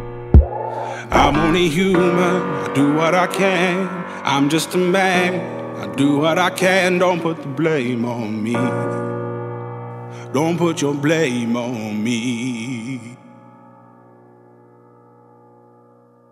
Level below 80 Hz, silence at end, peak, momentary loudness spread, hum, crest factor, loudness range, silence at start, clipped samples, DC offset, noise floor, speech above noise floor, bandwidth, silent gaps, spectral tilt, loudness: -30 dBFS; 3 s; -2 dBFS; 12 LU; 60 Hz at -35 dBFS; 18 dB; 9 LU; 0 s; under 0.1%; under 0.1%; -50 dBFS; 33 dB; 15.5 kHz; none; -5.5 dB/octave; -18 LUFS